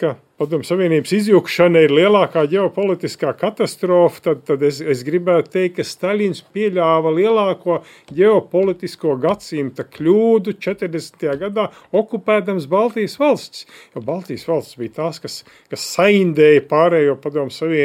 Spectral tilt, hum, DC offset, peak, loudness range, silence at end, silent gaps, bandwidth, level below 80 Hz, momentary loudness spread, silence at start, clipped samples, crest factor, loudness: -6 dB/octave; none; under 0.1%; 0 dBFS; 5 LU; 0 s; none; 16 kHz; -64 dBFS; 12 LU; 0 s; under 0.1%; 16 dB; -17 LUFS